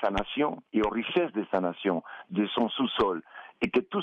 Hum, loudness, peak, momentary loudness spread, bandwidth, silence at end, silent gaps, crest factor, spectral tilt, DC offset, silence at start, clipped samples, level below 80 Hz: none; -29 LUFS; -14 dBFS; 6 LU; 8.2 kHz; 0 s; none; 16 dB; -7 dB/octave; under 0.1%; 0 s; under 0.1%; -52 dBFS